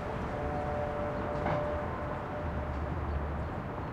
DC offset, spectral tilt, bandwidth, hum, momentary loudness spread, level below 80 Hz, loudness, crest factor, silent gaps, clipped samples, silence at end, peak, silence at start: under 0.1%; -8 dB/octave; 9 kHz; none; 4 LU; -42 dBFS; -35 LUFS; 16 dB; none; under 0.1%; 0 s; -18 dBFS; 0 s